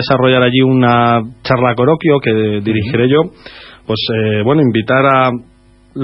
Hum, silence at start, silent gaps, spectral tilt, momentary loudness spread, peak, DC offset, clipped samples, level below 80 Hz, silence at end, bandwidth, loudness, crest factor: none; 0 s; none; -9 dB/octave; 8 LU; 0 dBFS; under 0.1%; under 0.1%; -46 dBFS; 0 s; 5.8 kHz; -12 LUFS; 12 dB